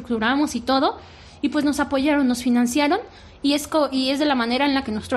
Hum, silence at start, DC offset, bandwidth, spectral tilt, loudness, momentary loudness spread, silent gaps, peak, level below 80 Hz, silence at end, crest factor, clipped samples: none; 0 s; under 0.1%; 14 kHz; -3.5 dB/octave; -21 LUFS; 5 LU; none; -6 dBFS; -50 dBFS; 0 s; 14 dB; under 0.1%